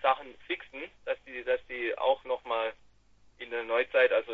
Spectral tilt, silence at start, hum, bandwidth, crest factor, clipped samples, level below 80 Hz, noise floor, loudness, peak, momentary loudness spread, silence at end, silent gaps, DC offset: -4.5 dB/octave; 0 s; none; 4.6 kHz; 20 dB; under 0.1%; -66 dBFS; -61 dBFS; -31 LUFS; -12 dBFS; 13 LU; 0 s; none; under 0.1%